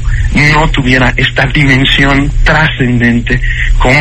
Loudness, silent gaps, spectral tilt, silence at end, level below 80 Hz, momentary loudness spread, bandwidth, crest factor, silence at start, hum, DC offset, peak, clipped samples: -8 LUFS; none; -5.5 dB/octave; 0 s; -14 dBFS; 5 LU; 8.8 kHz; 8 dB; 0 s; none; under 0.1%; 0 dBFS; 1%